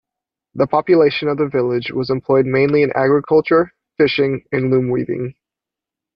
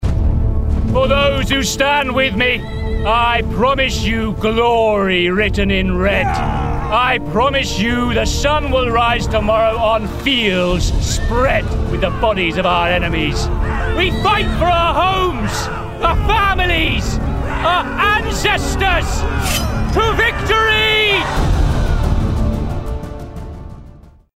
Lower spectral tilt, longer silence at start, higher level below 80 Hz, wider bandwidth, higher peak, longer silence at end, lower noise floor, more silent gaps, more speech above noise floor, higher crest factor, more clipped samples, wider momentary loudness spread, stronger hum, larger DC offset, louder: first, -9 dB/octave vs -5 dB/octave; first, 0.55 s vs 0 s; second, -54 dBFS vs -22 dBFS; second, 5.8 kHz vs 16 kHz; about the same, -2 dBFS vs -2 dBFS; first, 0.85 s vs 0.35 s; first, -86 dBFS vs -40 dBFS; neither; first, 71 dB vs 25 dB; about the same, 14 dB vs 12 dB; neither; about the same, 7 LU vs 6 LU; neither; neither; about the same, -16 LUFS vs -15 LUFS